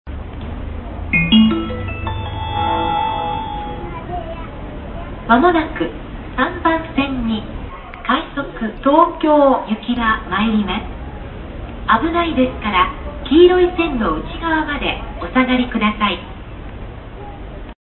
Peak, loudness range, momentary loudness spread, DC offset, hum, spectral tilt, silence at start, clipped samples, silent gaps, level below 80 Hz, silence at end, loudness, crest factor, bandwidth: 0 dBFS; 5 LU; 19 LU; under 0.1%; none; -11 dB/octave; 0.05 s; under 0.1%; none; -32 dBFS; 0.05 s; -17 LUFS; 18 dB; 4.3 kHz